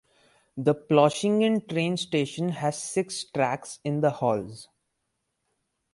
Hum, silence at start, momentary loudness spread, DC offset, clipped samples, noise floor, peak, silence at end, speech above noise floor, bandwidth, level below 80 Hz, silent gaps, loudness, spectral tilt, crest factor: none; 0.55 s; 10 LU; under 0.1%; under 0.1%; -79 dBFS; -6 dBFS; 1.3 s; 53 dB; 11.5 kHz; -68 dBFS; none; -26 LUFS; -5.5 dB/octave; 20 dB